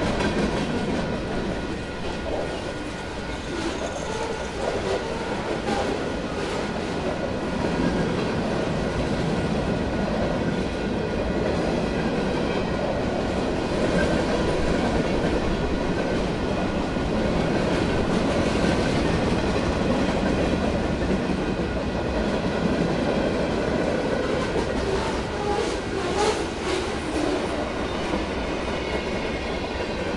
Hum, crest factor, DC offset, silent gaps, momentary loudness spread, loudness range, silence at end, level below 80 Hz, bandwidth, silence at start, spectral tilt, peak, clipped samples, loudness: none; 16 dB; under 0.1%; none; 5 LU; 4 LU; 0 s; -36 dBFS; 11.5 kHz; 0 s; -6 dB/octave; -8 dBFS; under 0.1%; -25 LUFS